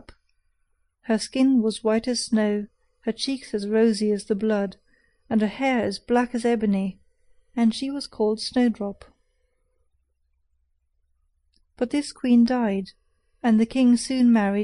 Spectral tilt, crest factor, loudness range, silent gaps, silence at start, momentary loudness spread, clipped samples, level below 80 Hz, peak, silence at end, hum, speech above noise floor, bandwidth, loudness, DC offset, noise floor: -5.5 dB/octave; 16 dB; 6 LU; none; 1.1 s; 11 LU; under 0.1%; -58 dBFS; -8 dBFS; 0 s; none; 48 dB; 11 kHz; -23 LUFS; under 0.1%; -70 dBFS